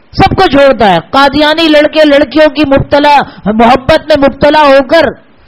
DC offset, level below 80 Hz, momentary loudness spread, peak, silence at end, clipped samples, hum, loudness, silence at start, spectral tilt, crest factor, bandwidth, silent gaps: 0.4%; -28 dBFS; 3 LU; 0 dBFS; 0.35 s; 5%; none; -6 LUFS; 0.15 s; -6 dB/octave; 6 dB; 13.5 kHz; none